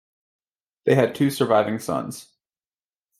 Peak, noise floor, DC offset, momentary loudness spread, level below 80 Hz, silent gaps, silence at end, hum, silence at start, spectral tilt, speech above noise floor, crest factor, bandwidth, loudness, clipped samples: -4 dBFS; under -90 dBFS; under 0.1%; 12 LU; -66 dBFS; none; 1 s; none; 0.85 s; -6 dB/octave; over 69 dB; 20 dB; 16 kHz; -22 LUFS; under 0.1%